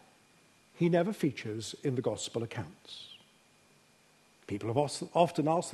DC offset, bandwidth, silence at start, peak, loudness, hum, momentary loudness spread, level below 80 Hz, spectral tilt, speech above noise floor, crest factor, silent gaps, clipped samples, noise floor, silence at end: under 0.1%; 12.5 kHz; 0.75 s; -12 dBFS; -32 LUFS; none; 17 LU; -72 dBFS; -5.5 dB/octave; 33 dB; 22 dB; none; under 0.1%; -65 dBFS; 0 s